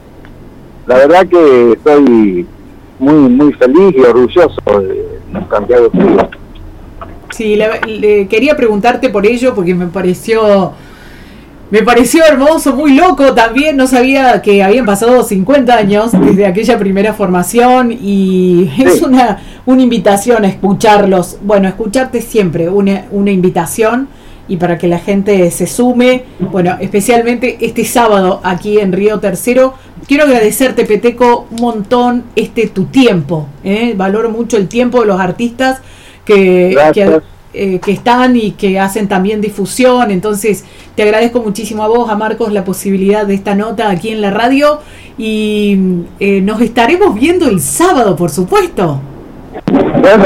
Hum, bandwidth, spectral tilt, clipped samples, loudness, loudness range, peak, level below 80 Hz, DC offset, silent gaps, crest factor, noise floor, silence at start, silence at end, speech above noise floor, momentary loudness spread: none; 16.5 kHz; -5.5 dB/octave; under 0.1%; -9 LUFS; 4 LU; 0 dBFS; -36 dBFS; under 0.1%; none; 8 dB; -32 dBFS; 0.15 s; 0 s; 24 dB; 8 LU